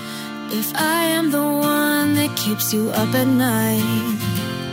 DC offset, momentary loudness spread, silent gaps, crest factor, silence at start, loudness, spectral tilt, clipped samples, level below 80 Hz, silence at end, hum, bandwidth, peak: under 0.1%; 6 LU; none; 14 dB; 0 s; -19 LUFS; -4.5 dB/octave; under 0.1%; -56 dBFS; 0 s; none; 16.5 kHz; -6 dBFS